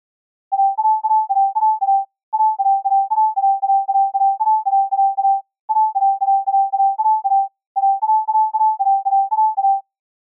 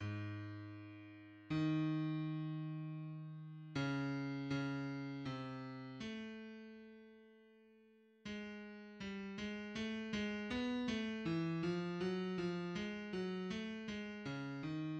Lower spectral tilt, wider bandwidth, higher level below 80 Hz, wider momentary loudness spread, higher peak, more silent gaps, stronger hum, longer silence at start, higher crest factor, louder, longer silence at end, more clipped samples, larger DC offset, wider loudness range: second, 5 dB/octave vs -6.5 dB/octave; second, 1.2 kHz vs 8.6 kHz; second, under -90 dBFS vs -72 dBFS; second, 3 LU vs 14 LU; first, -10 dBFS vs -28 dBFS; first, 2.23-2.32 s, 5.60-5.68 s, 7.66-7.75 s vs none; neither; first, 0.5 s vs 0 s; second, 8 dB vs 16 dB; first, -17 LUFS vs -43 LUFS; first, 0.5 s vs 0 s; neither; neither; second, 1 LU vs 10 LU